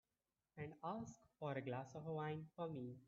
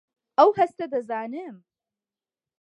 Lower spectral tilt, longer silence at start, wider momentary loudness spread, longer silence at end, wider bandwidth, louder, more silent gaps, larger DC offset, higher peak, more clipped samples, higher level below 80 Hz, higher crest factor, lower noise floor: about the same, -6.5 dB/octave vs -6 dB/octave; first, 0.55 s vs 0.4 s; second, 8 LU vs 18 LU; second, 0 s vs 1.05 s; second, 7.4 kHz vs 8.8 kHz; second, -50 LUFS vs -23 LUFS; neither; neither; second, -32 dBFS vs -4 dBFS; neither; second, -82 dBFS vs -76 dBFS; about the same, 18 dB vs 22 dB; about the same, under -90 dBFS vs under -90 dBFS